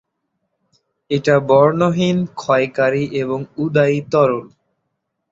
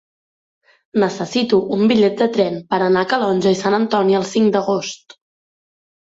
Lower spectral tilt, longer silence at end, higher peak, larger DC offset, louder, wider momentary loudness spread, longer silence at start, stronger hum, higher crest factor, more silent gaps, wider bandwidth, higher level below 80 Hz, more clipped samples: first, -7 dB/octave vs -5.5 dB/octave; second, 0.85 s vs 1.15 s; about the same, -2 dBFS vs -2 dBFS; neither; about the same, -17 LUFS vs -17 LUFS; first, 9 LU vs 6 LU; first, 1.1 s vs 0.95 s; neither; about the same, 16 dB vs 16 dB; neither; about the same, 7.8 kHz vs 7.8 kHz; about the same, -58 dBFS vs -60 dBFS; neither